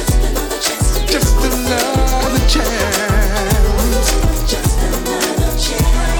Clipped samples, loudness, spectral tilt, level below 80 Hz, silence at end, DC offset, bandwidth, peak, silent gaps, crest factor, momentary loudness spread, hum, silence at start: under 0.1%; -15 LUFS; -4 dB/octave; -16 dBFS; 0 s; under 0.1%; 19 kHz; 0 dBFS; none; 12 dB; 3 LU; none; 0 s